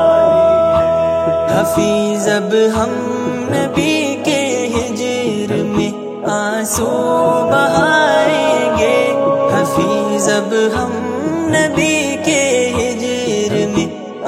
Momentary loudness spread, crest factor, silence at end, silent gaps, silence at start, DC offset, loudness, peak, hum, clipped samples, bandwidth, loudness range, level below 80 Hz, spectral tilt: 7 LU; 14 dB; 0 s; none; 0 s; under 0.1%; -14 LUFS; 0 dBFS; none; under 0.1%; 16 kHz; 4 LU; -42 dBFS; -4.5 dB/octave